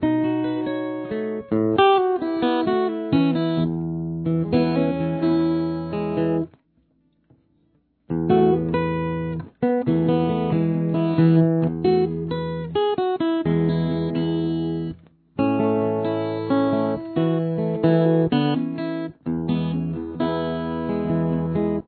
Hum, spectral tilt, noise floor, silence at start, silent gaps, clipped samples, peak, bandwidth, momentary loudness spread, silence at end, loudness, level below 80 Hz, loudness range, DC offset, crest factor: none; -11.5 dB/octave; -64 dBFS; 0 s; none; under 0.1%; -4 dBFS; 4.5 kHz; 9 LU; 0.05 s; -22 LUFS; -50 dBFS; 4 LU; under 0.1%; 16 dB